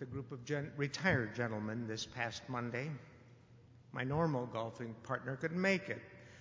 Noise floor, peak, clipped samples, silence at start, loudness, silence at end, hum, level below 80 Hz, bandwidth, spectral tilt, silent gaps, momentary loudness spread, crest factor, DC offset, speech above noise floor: -61 dBFS; -18 dBFS; under 0.1%; 0 s; -39 LUFS; 0 s; none; -66 dBFS; 7.6 kHz; -5.5 dB/octave; none; 12 LU; 22 dB; under 0.1%; 23 dB